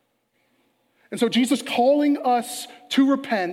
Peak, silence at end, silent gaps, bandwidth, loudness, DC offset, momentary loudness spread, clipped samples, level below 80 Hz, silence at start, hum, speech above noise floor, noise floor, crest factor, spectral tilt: -8 dBFS; 0 s; none; 15.5 kHz; -21 LUFS; under 0.1%; 11 LU; under 0.1%; -78 dBFS; 1.1 s; none; 48 dB; -69 dBFS; 16 dB; -4 dB/octave